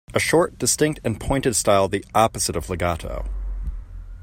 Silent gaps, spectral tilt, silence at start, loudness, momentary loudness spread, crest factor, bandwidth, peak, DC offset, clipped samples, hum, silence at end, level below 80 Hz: none; -4 dB/octave; 0.1 s; -21 LUFS; 14 LU; 20 dB; 16.5 kHz; -2 dBFS; under 0.1%; under 0.1%; none; 0 s; -34 dBFS